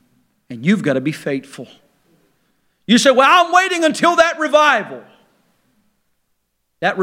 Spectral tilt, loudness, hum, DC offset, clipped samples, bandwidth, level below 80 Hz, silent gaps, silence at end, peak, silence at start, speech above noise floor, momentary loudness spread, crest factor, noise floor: -4 dB/octave; -14 LUFS; none; under 0.1%; under 0.1%; 16 kHz; -66 dBFS; none; 0 s; 0 dBFS; 0.5 s; 54 dB; 25 LU; 18 dB; -68 dBFS